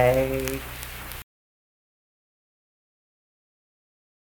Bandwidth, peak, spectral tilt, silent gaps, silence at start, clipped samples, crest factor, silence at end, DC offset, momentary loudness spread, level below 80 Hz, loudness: 19 kHz; -6 dBFS; -5 dB/octave; none; 0 s; under 0.1%; 26 dB; 3.05 s; under 0.1%; 15 LU; -44 dBFS; -28 LUFS